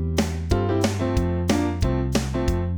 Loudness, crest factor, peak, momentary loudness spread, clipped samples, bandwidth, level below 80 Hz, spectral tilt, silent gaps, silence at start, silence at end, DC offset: -23 LUFS; 16 dB; -6 dBFS; 2 LU; under 0.1%; over 20 kHz; -30 dBFS; -6 dB/octave; none; 0 s; 0 s; 0.4%